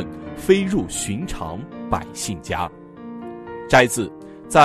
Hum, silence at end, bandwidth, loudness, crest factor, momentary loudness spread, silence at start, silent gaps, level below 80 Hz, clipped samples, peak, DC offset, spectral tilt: none; 0 s; 13.5 kHz; -22 LUFS; 20 dB; 19 LU; 0 s; none; -42 dBFS; under 0.1%; 0 dBFS; under 0.1%; -4.5 dB/octave